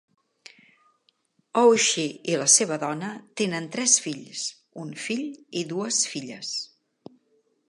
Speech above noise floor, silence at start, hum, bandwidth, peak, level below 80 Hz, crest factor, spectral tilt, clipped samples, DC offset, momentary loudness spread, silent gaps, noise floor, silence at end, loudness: 43 dB; 1.55 s; none; 11.5 kHz; -4 dBFS; -80 dBFS; 24 dB; -2 dB/octave; under 0.1%; under 0.1%; 15 LU; none; -68 dBFS; 1.05 s; -24 LUFS